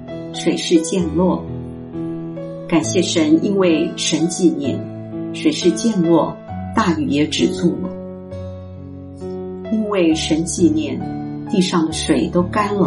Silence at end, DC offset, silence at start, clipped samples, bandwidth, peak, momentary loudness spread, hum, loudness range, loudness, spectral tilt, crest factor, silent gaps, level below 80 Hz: 0 s; under 0.1%; 0 s; under 0.1%; 11.5 kHz; -2 dBFS; 14 LU; none; 4 LU; -18 LUFS; -5 dB/octave; 16 dB; none; -44 dBFS